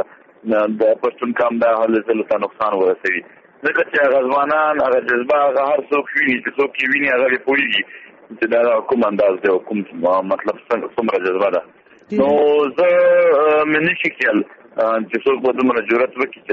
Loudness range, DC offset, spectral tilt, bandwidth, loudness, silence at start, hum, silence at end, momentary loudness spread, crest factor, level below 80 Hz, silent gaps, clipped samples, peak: 3 LU; under 0.1%; -2.5 dB/octave; 6.4 kHz; -17 LUFS; 0 s; none; 0 s; 7 LU; 14 dB; -62 dBFS; none; under 0.1%; -4 dBFS